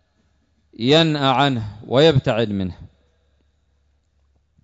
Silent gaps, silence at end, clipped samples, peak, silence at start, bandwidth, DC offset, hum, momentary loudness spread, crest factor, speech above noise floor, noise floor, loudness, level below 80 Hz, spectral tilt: none; 1.75 s; under 0.1%; -4 dBFS; 0.8 s; 7.8 kHz; under 0.1%; none; 11 LU; 18 dB; 46 dB; -64 dBFS; -18 LUFS; -50 dBFS; -6.5 dB/octave